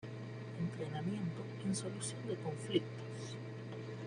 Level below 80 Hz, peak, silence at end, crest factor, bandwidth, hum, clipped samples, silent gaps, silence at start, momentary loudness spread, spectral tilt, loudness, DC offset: -76 dBFS; -20 dBFS; 0 s; 20 dB; 11 kHz; none; under 0.1%; none; 0 s; 9 LU; -5.5 dB/octave; -42 LUFS; under 0.1%